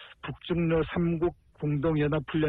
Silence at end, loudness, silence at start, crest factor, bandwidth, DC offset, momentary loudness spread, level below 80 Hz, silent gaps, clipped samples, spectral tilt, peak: 0 s; -28 LUFS; 0 s; 12 dB; 4.1 kHz; under 0.1%; 9 LU; -48 dBFS; none; under 0.1%; -10.5 dB/octave; -16 dBFS